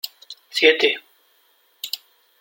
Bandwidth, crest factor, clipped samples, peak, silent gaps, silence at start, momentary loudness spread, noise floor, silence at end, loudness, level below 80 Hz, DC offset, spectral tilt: 17 kHz; 22 dB; under 0.1%; -2 dBFS; none; 0.05 s; 19 LU; -61 dBFS; 0.45 s; -19 LUFS; -78 dBFS; under 0.1%; -0.5 dB/octave